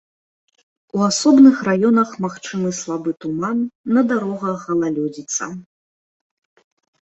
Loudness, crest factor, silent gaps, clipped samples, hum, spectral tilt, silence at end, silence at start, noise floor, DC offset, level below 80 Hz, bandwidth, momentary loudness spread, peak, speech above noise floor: -18 LUFS; 18 dB; 3.75-3.84 s; under 0.1%; none; -5 dB/octave; 1.45 s; 0.95 s; under -90 dBFS; under 0.1%; -64 dBFS; 8.2 kHz; 13 LU; -2 dBFS; over 73 dB